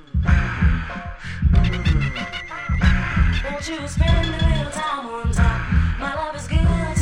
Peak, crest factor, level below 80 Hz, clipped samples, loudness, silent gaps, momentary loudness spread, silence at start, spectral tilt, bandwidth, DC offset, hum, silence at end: -4 dBFS; 16 dB; -22 dBFS; under 0.1%; -21 LUFS; none; 8 LU; 0.15 s; -6 dB/octave; 10.5 kHz; under 0.1%; none; 0 s